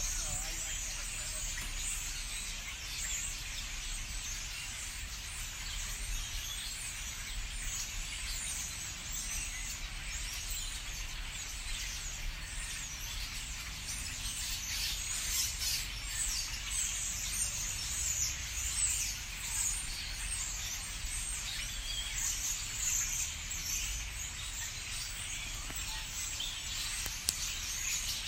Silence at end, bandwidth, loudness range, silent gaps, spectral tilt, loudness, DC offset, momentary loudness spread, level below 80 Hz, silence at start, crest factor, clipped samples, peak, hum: 0 s; 16 kHz; 6 LU; none; 0 dB/octave; -36 LUFS; under 0.1%; 7 LU; -44 dBFS; 0 s; 34 dB; under 0.1%; -4 dBFS; none